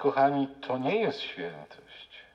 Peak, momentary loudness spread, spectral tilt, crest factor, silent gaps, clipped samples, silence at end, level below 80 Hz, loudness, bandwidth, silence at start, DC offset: -12 dBFS; 22 LU; -7 dB/octave; 18 dB; none; under 0.1%; 0.15 s; -72 dBFS; -29 LUFS; 7.6 kHz; 0 s; under 0.1%